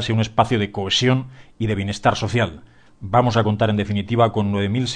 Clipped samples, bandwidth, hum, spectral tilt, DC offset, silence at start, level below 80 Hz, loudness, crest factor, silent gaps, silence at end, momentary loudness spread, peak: under 0.1%; 9.8 kHz; none; -6 dB/octave; 0.2%; 0 s; -46 dBFS; -20 LUFS; 16 dB; none; 0 s; 7 LU; -4 dBFS